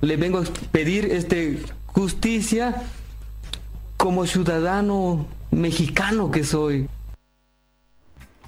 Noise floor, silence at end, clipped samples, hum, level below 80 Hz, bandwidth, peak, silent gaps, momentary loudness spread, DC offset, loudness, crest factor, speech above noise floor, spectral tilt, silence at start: -64 dBFS; 0 s; under 0.1%; none; -36 dBFS; 16.5 kHz; -4 dBFS; none; 14 LU; under 0.1%; -23 LUFS; 20 dB; 42 dB; -5.5 dB/octave; 0 s